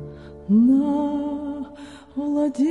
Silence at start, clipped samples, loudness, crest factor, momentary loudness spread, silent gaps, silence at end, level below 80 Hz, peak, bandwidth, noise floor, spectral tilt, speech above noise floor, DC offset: 0 s; under 0.1%; -21 LUFS; 12 dB; 21 LU; none; 0 s; -52 dBFS; -8 dBFS; 10 kHz; -41 dBFS; -8.5 dB/octave; 22 dB; under 0.1%